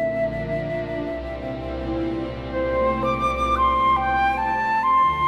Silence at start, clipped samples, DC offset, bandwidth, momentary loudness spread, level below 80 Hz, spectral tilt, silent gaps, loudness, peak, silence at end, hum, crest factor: 0 s; under 0.1%; under 0.1%; 12 kHz; 11 LU; -38 dBFS; -6.5 dB/octave; none; -22 LUFS; -10 dBFS; 0 s; none; 12 dB